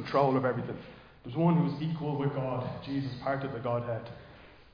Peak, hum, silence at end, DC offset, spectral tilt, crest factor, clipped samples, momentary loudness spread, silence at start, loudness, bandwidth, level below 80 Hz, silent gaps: -12 dBFS; none; 0.1 s; under 0.1%; -9.5 dB/octave; 18 dB; under 0.1%; 17 LU; 0 s; -31 LUFS; 5.2 kHz; -60 dBFS; none